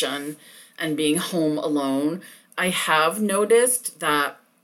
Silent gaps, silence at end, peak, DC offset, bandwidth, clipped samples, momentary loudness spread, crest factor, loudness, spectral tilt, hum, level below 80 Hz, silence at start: none; 0.3 s; -6 dBFS; under 0.1%; 18.5 kHz; under 0.1%; 13 LU; 16 dB; -22 LUFS; -3 dB/octave; none; -74 dBFS; 0 s